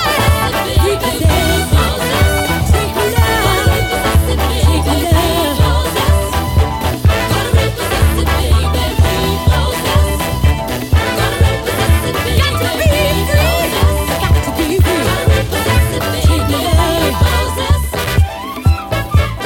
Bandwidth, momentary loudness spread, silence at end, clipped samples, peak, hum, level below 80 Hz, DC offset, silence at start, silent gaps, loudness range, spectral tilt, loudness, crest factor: 17 kHz; 3 LU; 0 s; under 0.1%; 0 dBFS; none; -18 dBFS; under 0.1%; 0 s; none; 1 LU; -5 dB/octave; -13 LUFS; 12 dB